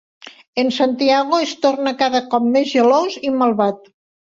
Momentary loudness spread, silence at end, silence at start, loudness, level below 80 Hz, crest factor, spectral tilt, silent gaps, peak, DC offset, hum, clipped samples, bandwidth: 6 LU; 0.55 s; 0.25 s; -17 LUFS; -64 dBFS; 14 dB; -4.5 dB/octave; 0.47-0.53 s; -2 dBFS; under 0.1%; none; under 0.1%; 7.6 kHz